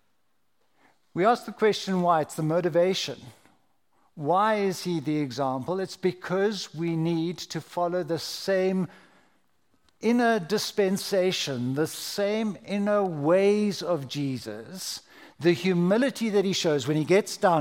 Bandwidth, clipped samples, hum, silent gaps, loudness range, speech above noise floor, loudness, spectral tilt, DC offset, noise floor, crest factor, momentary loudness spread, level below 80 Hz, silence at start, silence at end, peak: 17 kHz; under 0.1%; none; none; 3 LU; 50 dB; -26 LUFS; -5 dB/octave; under 0.1%; -76 dBFS; 18 dB; 8 LU; -74 dBFS; 1.15 s; 0 s; -8 dBFS